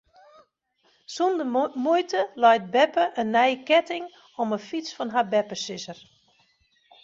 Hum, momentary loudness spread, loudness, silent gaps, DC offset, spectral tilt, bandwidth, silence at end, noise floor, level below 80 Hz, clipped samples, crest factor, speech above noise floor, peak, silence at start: none; 14 LU; -24 LUFS; none; under 0.1%; -4 dB/octave; 7.8 kHz; 1.1 s; -67 dBFS; -74 dBFS; under 0.1%; 18 dB; 44 dB; -6 dBFS; 1.1 s